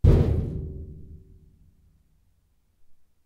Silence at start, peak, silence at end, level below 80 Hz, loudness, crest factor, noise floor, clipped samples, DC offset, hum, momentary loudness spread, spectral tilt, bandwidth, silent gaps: 0.05 s; -6 dBFS; 0.35 s; -32 dBFS; -25 LUFS; 22 dB; -66 dBFS; under 0.1%; under 0.1%; none; 27 LU; -10 dB/octave; 5.8 kHz; none